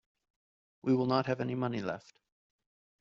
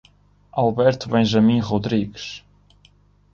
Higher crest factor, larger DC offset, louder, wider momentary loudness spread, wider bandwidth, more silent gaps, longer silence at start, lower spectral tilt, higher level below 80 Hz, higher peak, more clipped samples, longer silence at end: about the same, 20 dB vs 16 dB; neither; second, -33 LUFS vs -20 LUFS; second, 11 LU vs 17 LU; about the same, 7.2 kHz vs 7.2 kHz; neither; first, 0.85 s vs 0.55 s; about the same, -6 dB/octave vs -7 dB/octave; second, -74 dBFS vs -50 dBFS; second, -16 dBFS vs -4 dBFS; neither; about the same, 1 s vs 0.95 s